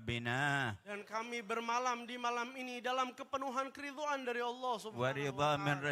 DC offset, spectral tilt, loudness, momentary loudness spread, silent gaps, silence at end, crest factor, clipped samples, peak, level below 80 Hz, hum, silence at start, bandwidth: under 0.1%; -4.5 dB/octave; -38 LUFS; 7 LU; none; 0 s; 18 dB; under 0.1%; -20 dBFS; -72 dBFS; none; 0 s; 15.5 kHz